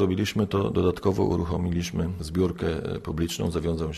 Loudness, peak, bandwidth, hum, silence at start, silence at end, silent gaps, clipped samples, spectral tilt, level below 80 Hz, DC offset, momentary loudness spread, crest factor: -27 LUFS; -10 dBFS; 13 kHz; none; 0 s; 0 s; none; under 0.1%; -6.5 dB/octave; -42 dBFS; under 0.1%; 5 LU; 14 dB